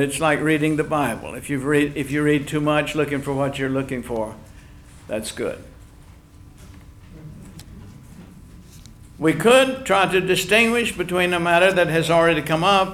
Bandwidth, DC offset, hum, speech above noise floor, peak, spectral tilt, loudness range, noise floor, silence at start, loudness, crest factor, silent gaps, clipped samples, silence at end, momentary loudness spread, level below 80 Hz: 17.5 kHz; under 0.1%; none; 26 dB; -4 dBFS; -4.5 dB/octave; 17 LU; -46 dBFS; 0 s; -20 LUFS; 18 dB; none; under 0.1%; 0 s; 14 LU; -46 dBFS